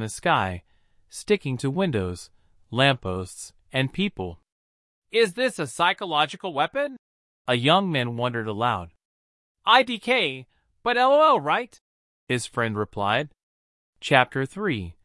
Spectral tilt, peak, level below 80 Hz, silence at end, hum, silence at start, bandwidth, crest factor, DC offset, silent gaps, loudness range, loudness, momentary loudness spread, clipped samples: -4.5 dB/octave; -2 dBFS; -60 dBFS; 0.1 s; none; 0 s; 12 kHz; 24 dB; under 0.1%; 4.52-5.02 s, 6.99-7.45 s, 9.05-9.55 s, 11.81-12.27 s, 13.43-13.93 s; 4 LU; -23 LUFS; 16 LU; under 0.1%